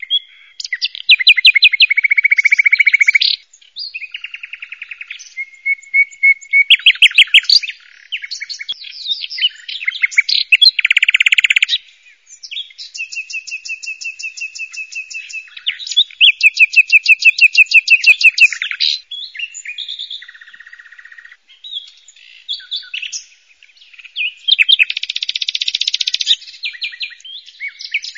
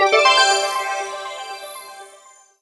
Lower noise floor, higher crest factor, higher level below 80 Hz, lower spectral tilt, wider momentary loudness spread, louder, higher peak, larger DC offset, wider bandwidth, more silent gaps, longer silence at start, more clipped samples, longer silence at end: about the same, -48 dBFS vs -48 dBFS; about the same, 16 dB vs 20 dB; about the same, -72 dBFS vs -72 dBFS; second, 6.5 dB/octave vs 2 dB/octave; about the same, 20 LU vs 21 LU; first, -10 LUFS vs -16 LUFS; about the same, 0 dBFS vs 0 dBFS; neither; first, 16 kHz vs 11 kHz; neither; about the same, 0.1 s vs 0 s; neither; second, 0.05 s vs 0.55 s